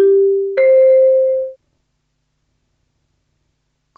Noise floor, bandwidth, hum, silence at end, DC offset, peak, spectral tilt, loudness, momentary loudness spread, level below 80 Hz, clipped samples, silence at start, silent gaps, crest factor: -68 dBFS; 4.2 kHz; none; 2.45 s; under 0.1%; -4 dBFS; -7.5 dB/octave; -12 LUFS; 10 LU; -70 dBFS; under 0.1%; 0 s; none; 12 dB